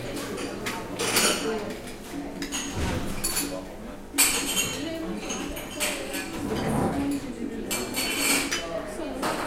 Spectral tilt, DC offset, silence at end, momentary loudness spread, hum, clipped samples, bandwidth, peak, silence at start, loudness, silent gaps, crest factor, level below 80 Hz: -2.5 dB/octave; under 0.1%; 0 s; 12 LU; none; under 0.1%; 16.5 kHz; -6 dBFS; 0 s; -27 LUFS; none; 22 dB; -44 dBFS